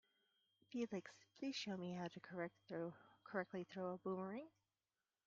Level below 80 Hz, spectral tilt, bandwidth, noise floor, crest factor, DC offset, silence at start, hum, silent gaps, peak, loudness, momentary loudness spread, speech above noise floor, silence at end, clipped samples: under -90 dBFS; -4.5 dB/octave; 7.2 kHz; under -90 dBFS; 20 dB; under 0.1%; 0.7 s; none; none; -30 dBFS; -49 LUFS; 6 LU; over 41 dB; 0.75 s; under 0.1%